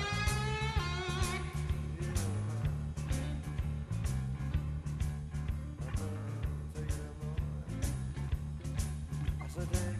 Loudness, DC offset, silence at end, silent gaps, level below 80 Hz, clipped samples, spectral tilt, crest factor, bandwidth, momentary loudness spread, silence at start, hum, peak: -37 LUFS; under 0.1%; 0 s; none; -40 dBFS; under 0.1%; -5.5 dB/octave; 16 dB; 13.5 kHz; 5 LU; 0 s; none; -18 dBFS